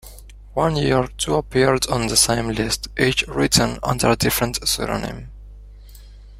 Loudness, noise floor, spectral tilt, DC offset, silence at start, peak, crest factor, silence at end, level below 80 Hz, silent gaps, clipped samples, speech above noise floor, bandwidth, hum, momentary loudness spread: -19 LUFS; -40 dBFS; -3.5 dB/octave; under 0.1%; 0.05 s; 0 dBFS; 20 dB; 0 s; -36 dBFS; none; under 0.1%; 21 dB; 16 kHz; 50 Hz at -35 dBFS; 7 LU